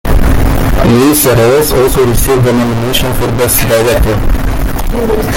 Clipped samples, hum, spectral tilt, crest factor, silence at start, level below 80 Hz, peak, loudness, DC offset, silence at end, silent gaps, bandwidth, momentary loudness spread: under 0.1%; none; -5 dB/octave; 8 dB; 0.05 s; -14 dBFS; 0 dBFS; -10 LUFS; under 0.1%; 0 s; none; 17.5 kHz; 8 LU